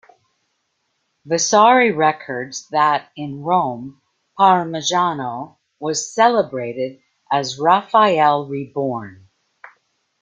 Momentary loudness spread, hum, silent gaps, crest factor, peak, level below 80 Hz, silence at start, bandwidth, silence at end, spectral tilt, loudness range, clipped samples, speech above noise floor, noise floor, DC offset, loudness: 15 LU; none; none; 18 dB; -2 dBFS; -66 dBFS; 1.25 s; 9.4 kHz; 1.1 s; -3.5 dB/octave; 2 LU; under 0.1%; 53 dB; -70 dBFS; under 0.1%; -18 LUFS